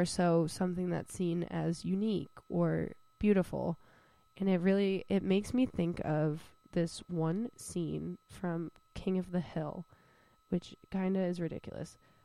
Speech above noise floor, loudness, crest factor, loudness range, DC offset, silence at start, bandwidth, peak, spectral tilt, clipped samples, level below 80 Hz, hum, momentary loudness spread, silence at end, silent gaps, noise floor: 33 dB; -35 LUFS; 18 dB; 6 LU; under 0.1%; 0 s; 13 kHz; -16 dBFS; -7 dB/octave; under 0.1%; -60 dBFS; none; 11 LU; 0.3 s; none; -67 dBFS